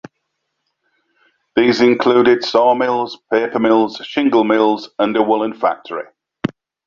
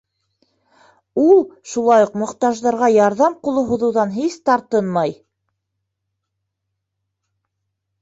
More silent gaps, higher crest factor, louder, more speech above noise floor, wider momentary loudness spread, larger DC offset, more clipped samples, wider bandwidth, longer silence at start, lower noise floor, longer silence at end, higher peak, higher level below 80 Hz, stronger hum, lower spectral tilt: neither; about the same, 16 dB vs 16 dB; about the same, -15 LUFS vs -17 LUFS; about the same, 58 dB vs 61 dB; first, 13 LU vs 7 LU; neither; neither; second, 7.2 kHz vs 8 kHz; first, 1.55 s vs 1.15 s; second, -73 dBFS vs -77 dBFS; second, 0.4 s vs 2.9 s; about the same, -2 dBFS vs -2 dBFS; about the same, -58 dBFS vs -60 dBFS; neither; about the same, -6 dB/octave vs -6 dB/octave